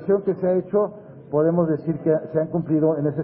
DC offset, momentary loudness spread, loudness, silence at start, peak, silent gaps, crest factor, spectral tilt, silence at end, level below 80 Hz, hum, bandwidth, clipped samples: under 0.1%; 5 LU; -22 LUFS; 0 s; -6 dBFS; none; 14 dB; -14.5 dB/octave; 0 s; -60 dBFS; none; 2.8 kHz; under 0.1%